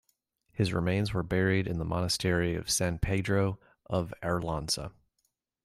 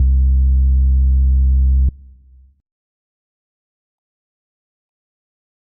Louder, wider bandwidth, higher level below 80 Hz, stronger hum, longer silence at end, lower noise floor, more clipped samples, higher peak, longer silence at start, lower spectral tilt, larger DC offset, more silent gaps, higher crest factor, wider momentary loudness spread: second, -30 LUFS vs -15 LUFS; first, 15.5 kHz vs 0.5 kHz; second, -48 dBFS vs -16 dBFS; neither; second, 0.75 s vs 3.7 s; first, -79 dBFS vs -46 dBFS; neither; second, -14 dBFS vs -6 dBFS; first, 0.55 s vs 0 s; second, -5 dB/octave vs -19.5 dB/octave; neither; neither; first, 16 dB vs 10 dB; first, 6 LU vs 2 LU